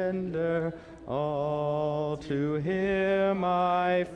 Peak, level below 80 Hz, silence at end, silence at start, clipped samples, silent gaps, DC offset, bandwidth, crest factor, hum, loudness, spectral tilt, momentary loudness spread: -16 dBFS; -56 dBFS; 0 s; 0 s; under 0.1%; none; under 0.1%; 9.6 kHz; 12 dB; none; -28 LUFS; -8 dB/octave; 7 LU